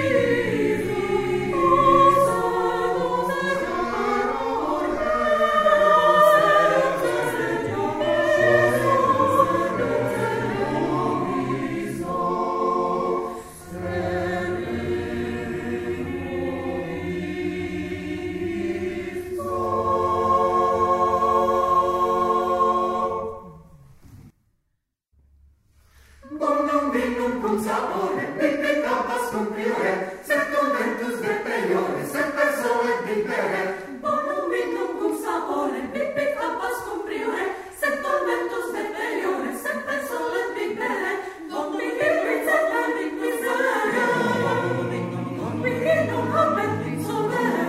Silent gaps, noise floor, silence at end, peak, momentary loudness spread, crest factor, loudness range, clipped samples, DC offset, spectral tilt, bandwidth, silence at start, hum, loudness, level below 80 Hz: none; -75 dBFS; 0 s; -4 dBFS; 10 LU; 18 dB; 9 LU; under 0.1%; under 0.1%; -5.5 dB/octave; 16 kHz; 0 s; none; -23 LUFS; -50 dBFS